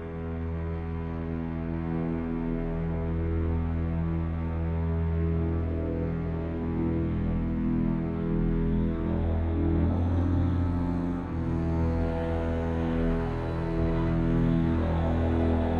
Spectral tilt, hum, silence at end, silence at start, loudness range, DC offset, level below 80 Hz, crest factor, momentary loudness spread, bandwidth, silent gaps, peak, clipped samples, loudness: -10.5 dB/octave; none; 0 s; 0 s; 3 LU; under 0.1%; -36 dBFS; 14 dB; 6 LU; 4.6 kHz; none; -14 dBFS; under 0.1%; -29 LUFS